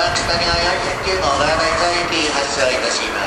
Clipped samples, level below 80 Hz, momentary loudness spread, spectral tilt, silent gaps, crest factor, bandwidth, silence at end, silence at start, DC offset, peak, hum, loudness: under 0.1%; -34 dBFS; 2 LU; -2.5 dB/octave; none; 14 dB; 15 kHz; 0 s; 0 s; under 0.1%; -2 dBFS; none; -16 LUFS